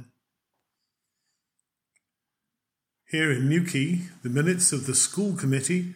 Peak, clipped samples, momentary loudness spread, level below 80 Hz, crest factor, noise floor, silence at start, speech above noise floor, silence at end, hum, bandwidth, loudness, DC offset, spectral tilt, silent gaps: -8 dBFS; under 0.1%; 8 LU; -74 dBFS; 20 dB; -85 dBFS; 0 s; 61 dB; 0 s; none; 16.5 kHz; -24 LUFS; under 0.1%; -4 dB/octave; none